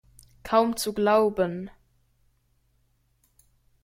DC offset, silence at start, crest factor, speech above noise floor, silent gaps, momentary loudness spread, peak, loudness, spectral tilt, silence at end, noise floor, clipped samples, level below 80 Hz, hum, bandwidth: under 0.1%; 0.45 s; 20 dB; 45 dB; none; 19 LU; -8 dBFS; -24 LUFS; -5 dB/octave; 2.15 s; -68 dBFS; under 0.1%; -58 dBFS; none; 16.5 kHz